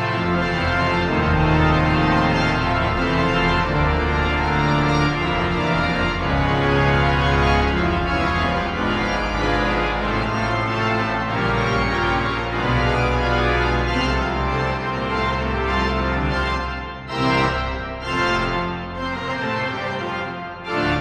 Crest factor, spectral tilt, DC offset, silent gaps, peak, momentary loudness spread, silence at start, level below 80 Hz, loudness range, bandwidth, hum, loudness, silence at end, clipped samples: 16 dB; -6.5 dB/octave; under 0.1%; none; -4 dBFS; 7 LU; 0 s; -28 dBFS; 4 LU; 10 kHz; none; -20 LUFS; 0 s; under 0.1%